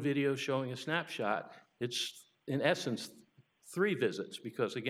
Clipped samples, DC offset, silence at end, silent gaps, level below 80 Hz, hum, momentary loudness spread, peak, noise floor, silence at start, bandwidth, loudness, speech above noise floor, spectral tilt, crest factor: under 0.1%; under 0.1%; 0 s; none; -90 dBFS; none; 10 LU; -14 dBFS; -63 dBFS; 0 s; 15.5 kHz; -36 LUFS; 28 dB; -4.5 dB/octave; 22 dB